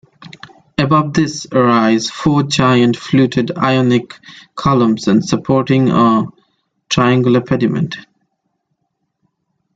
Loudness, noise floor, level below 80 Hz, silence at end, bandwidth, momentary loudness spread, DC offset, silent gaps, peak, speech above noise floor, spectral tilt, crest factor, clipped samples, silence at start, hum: -14 LUFS; -70 dBFS; -48 dBFS; 1.75 s; 9.2 kHz; 9 LU; under 0.1%; none; 0 dBFS; 57 dB; -6 dB/octave; 14 dB; under 0.1%; 0.2 s; none